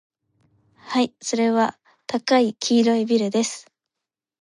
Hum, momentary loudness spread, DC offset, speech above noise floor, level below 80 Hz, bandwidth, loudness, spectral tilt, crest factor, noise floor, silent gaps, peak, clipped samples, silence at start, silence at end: none; 9 LU; under 0.1%; 66 dB; -74 dBFS; 11 kHz; -21 LUFS; -4 dB/octave; 16 dB; -86 dBFS; none; -6 dBFS; under 0.1%; 0.85 s; 0.8 s